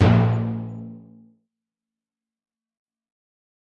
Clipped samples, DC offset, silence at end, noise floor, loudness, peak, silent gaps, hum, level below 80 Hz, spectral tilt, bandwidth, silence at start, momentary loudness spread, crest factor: under 0.1%; under 0.1%; 2.7 s; under -90 dBFS; -22 LUFS; -4 dBFS; none; none; -50 dBFS; -9 dB/octave; 6.2 kHz; 0 s; 23 LU; 20 dB